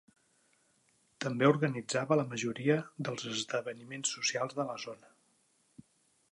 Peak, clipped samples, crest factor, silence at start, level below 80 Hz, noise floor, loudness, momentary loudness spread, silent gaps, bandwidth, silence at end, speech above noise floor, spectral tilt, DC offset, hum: -12 dBFS; under 0.1%; 22 dB; 1.2 s; -80 dBFS; -72 dBFS; -33 LUFS; 12 LU; none; 11.5 kHz; 1.35 s; 39 dB; -4.5 dB/octave; under 0.1%; none